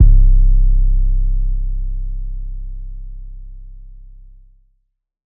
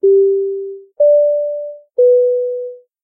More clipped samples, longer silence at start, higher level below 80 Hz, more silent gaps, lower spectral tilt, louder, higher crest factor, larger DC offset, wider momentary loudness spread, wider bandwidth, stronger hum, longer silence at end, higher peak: neither; about the same, 0 s vs 0.05 s; first, -14 dBFS vs -88 dBFS; neither; first, -15 dB/octave vs -12.5 dB/octave; second, -20 LUFS vs -14 LUFS; about the same, 14 dB vs 10 dB; neither; first, 23 LU vs 14 LU; second, 0.5 kHz vs 0.8 kHz; neither; first, 1.4 s vs 0.25 s; first, 0 dBFS vs -4 dBFS